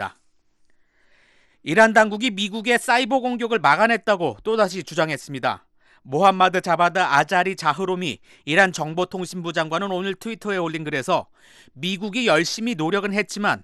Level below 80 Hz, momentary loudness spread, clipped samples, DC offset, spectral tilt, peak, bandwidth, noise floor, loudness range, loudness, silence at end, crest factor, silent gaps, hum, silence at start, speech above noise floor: -64 dBFS; 10 LU; under 0.1%; under 0.1%; -4 dB/octave; -4 dBFS; 12.5 kHz; -60 dBFS; 5 LU; -21 LUFS; 0 s; 18 dB; none; none; 0 s; 39 dB